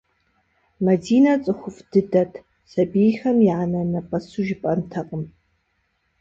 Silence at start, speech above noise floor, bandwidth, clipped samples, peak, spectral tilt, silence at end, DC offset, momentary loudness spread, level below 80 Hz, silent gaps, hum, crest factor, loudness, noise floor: 0.8 s; 49 dB; 7.8 kHz; under 0.1%; -4 dBFS; -8.5 dB/octave; 0.9 s; under 0.1%; 12 LU; -56 dBFS; none; none; 16 dB; -21 LUFS; -69 dBFS